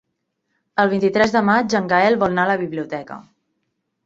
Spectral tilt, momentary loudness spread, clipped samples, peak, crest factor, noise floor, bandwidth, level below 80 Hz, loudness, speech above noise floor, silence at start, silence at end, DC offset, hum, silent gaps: -6 dB/octave; 13 LU; under 0.1%; -2 dBFS; 18 dB; -74 dBFS; 7.8 kHz; -56 dBFS; -18 LUFS; 56 dB; 0.75 s; 0.85 s; under 0.1%; none; none